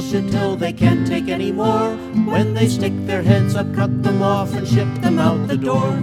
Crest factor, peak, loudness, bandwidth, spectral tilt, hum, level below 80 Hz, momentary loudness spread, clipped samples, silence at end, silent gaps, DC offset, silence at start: 16 dB; 0 dBFS; -18 LUFS; 14.5 kHz; -7 dB/octave; none; -46 dBFS; 4 LU; under 0.1%; 0 s; none; under 0.1%; 0 s